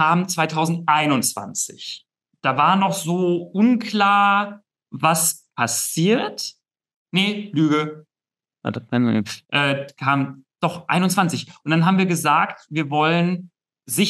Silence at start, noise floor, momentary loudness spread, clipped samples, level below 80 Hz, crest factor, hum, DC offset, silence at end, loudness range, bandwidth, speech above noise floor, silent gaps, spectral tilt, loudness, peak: 0 s; under -90 dBFS; 12 LU; under 0.1%; -74 dBFS; 18 dB; none; under 0.1%; 0 s; 4 LU; 14 kHz; over 70 dB; 6.96-7.06 s; -4.5 dB/octave; -20 LUFS; -2 dBFS